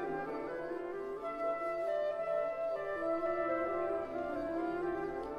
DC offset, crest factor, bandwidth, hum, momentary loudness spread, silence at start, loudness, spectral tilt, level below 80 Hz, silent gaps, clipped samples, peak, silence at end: under 0.1%; 14 dB; 10 kHz; none; 6 LU; 0 s; -37 LUFS; -7 dB/octave; -64 dBFS; none; under 0.1%; -24 dBFS; 0 s